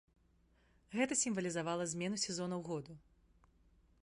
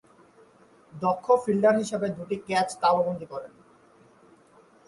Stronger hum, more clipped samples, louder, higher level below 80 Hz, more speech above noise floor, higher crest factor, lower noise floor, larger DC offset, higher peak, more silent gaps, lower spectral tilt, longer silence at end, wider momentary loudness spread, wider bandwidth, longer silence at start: neither; neither; second, -38 LUFS vs -25 LUFS; about the same, -72 dBFS vs -68 dBFS; about the same, 33 dB vs 32 dB; about the same, 20 dB vs 18 dB; first, -72 dBFS vs -57 dBFS; neither; second, -22 dBFS vs -8 dBFS; neither; second, -3.5 dB/octave vs -5.5 dB/octave; second, 1.05 s vs 1.4 s; second, 11 LU vs 14 LU; about the same, 11.5 kHz vs 11.5 kHz; about the same, 0.9 s vs 0.95 s